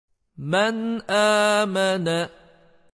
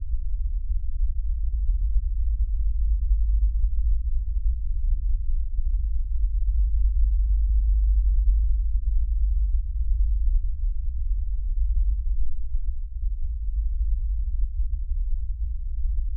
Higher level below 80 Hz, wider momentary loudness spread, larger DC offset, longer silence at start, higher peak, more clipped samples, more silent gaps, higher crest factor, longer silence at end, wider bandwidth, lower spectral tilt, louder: second, -66 dBFS vs -22 dBFS; first, 10 LU vs 7 LU; neither; first, 0.4 s vs 0 s; about the same, -8 dBFS vs -10 dBFS; neither; neither; about the same, 14 dB vs 12 dB; first, 0.65 s vs 0 s; first, 11 kHz vs 0.2 kHz; second, -4 dB/octave vs -25.5 dB/octave; first, -21 LUFS vs -28 LUFS